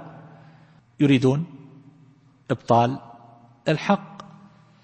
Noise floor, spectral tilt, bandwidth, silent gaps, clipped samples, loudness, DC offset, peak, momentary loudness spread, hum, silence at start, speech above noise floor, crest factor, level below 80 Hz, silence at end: -54 dBFS; -7.5 dB/octave; 8.8 kHz; none; under 0.1%; -22 LUFS; under 0.1%; -4 dBFS; 21 LU; none; 0 s; 34 dB; 20 dB; -64 dBFS; 0.6 s